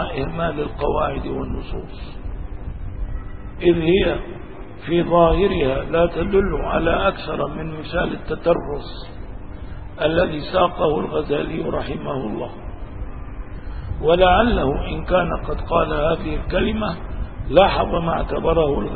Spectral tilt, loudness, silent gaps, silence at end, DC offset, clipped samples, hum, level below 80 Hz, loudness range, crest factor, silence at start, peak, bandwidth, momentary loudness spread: -10.5 dB/octave; -20 LUFS; none; 0 s; 1%; under 0.1%; none; -30 dBFS; 6 LU; 20 dB; 0 s; 0 dBFS; 4.8 kHz; 19 LU